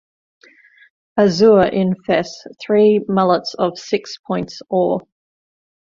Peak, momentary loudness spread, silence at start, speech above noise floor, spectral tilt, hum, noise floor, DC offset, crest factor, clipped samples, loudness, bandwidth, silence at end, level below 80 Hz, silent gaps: -2 dBFS; 12 LU; 1.15 s; 33 dB; -6.5 dB/octave; none; -49 dBFS; under 0.1%; 16 dB; under 0.1%; -17 LUFS; 7.4 kHz; 0.9 s; -54 dBFS; 4.19-4.24 s